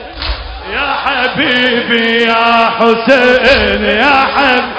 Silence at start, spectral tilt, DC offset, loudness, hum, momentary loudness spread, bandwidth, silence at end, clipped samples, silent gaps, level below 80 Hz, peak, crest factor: 0 s; -5 dB/octave; under 0.1%; -10 LUFS; none; 11 LU; 8 kHz; 0 s; 0.9%; none; -30 dBFS; 0 dBFS; 10 dB